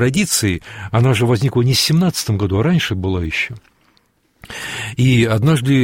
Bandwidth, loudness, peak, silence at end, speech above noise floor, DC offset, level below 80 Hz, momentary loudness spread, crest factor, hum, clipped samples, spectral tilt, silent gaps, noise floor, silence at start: 16.5 kHz; -16 LUFS; -2 dBFS; 0 s; 43 dB; under 0.1%; -40 dBFS; 11 LU; 14 dB; none; under 0.1%; -5 dB/octave; none; -59 dBFS; 0 s